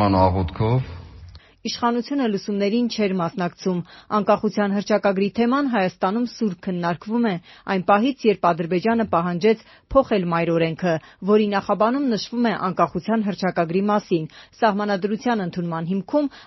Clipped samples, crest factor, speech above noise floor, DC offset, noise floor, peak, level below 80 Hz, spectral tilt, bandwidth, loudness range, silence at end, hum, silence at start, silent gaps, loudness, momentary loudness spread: under 0.1%; 18 dB; 23 dB; under 0.1%; -44 dBFS; -4 dBFS; -48 dBFS; -5.5 dB/octave; 6.2 kHz; 2 LU; 0.05 s; none; 0 s; none; -22 LUFS; 7 LU